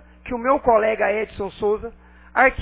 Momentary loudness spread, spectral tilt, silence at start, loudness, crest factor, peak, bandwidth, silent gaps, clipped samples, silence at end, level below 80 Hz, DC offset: 11 LU; -9 dB/octave; 0.25 s; -21 LUFS; 20 dB; -2 dBFS; 4 kHz; none; under 0.1%; 0 s; -44 dBFS; under 0.1%